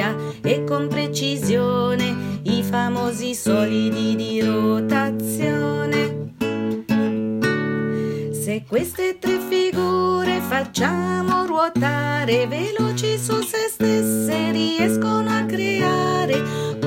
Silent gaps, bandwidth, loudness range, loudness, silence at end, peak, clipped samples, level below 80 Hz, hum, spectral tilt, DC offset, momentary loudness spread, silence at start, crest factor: none; 16.5 kHz; 2 LU; -21 LUFS; 0 s; -4 dBFS; under 0.1%; -58 dBFS; none; -5 dB/octave; under 0.1%; 5 LU; 0 s; 16 dB